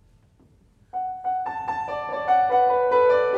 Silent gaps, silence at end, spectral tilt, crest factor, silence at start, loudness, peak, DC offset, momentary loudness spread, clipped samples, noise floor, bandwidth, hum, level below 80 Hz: none; 0 s; -5.5 dB/octave; 14 dB; 0.95 s; -23 LUFS; -8 dBFS; under 0.1%; 12 LU; under 0.1%; -57 dBFS; 6.8 kHz; none; -60 dBFS